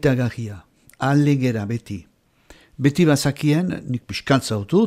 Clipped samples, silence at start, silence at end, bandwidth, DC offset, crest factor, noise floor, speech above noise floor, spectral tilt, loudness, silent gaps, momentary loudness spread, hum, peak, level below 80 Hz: under 0.1%; 0.05 s; 0 s; 15.5 kHz; under 0.1%; 16 dB; -51 dBFS; 32 dB; -6.5 dB/octave; -20 LUFS; none; 15 LU; none; -4 dBFS; -52 dBFS